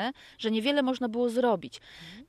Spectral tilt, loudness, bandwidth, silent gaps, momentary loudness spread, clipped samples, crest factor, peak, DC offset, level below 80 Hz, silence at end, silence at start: -5 dB/octave; -28 LUFS; 13.5 kHz; none; 18 LU; under 0.1%; 16 dB; -12 dBFS; under 0.1%; -68 dBFS; 0.05 s; 0 s